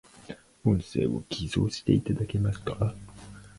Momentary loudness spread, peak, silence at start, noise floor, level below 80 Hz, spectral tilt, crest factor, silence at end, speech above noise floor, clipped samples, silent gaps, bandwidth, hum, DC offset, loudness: 20 LU; -8 dBFS; 0.2 s; -47 dBFS; -46 dBFS; -7 dB/octave; 20 dB; 0.1 s; 20 dB; under 0.1%; none; 11.5 kHz; none; under 0.1%; -29 LUFS